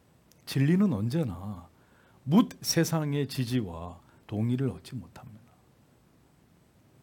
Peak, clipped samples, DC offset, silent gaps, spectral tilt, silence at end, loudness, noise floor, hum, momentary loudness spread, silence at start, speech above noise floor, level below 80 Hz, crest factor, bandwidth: -10 dBFS; under 0.1%; under 0.1%; none; -6 dB/octave; 1.65 s; -28 LUFS; -62 dBFS; none; 19 LU; 0.45 s; 34 dB; -64 dBFS; 20 dB; 18 kHz